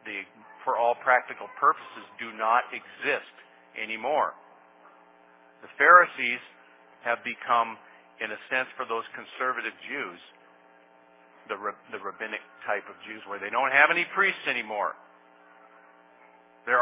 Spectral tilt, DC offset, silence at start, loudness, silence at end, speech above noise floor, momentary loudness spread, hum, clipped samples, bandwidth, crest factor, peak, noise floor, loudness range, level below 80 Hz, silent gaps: 0.5 dB/octave; under 0.1%; 0.05 s; -26 LUFS; 0 s; 30 dB; 18 LU; none; under 0.1%; 3.9 kHz; 26 dB; -2 dBFS; -57 dBFS; 11 LU; under -90 dBFS; none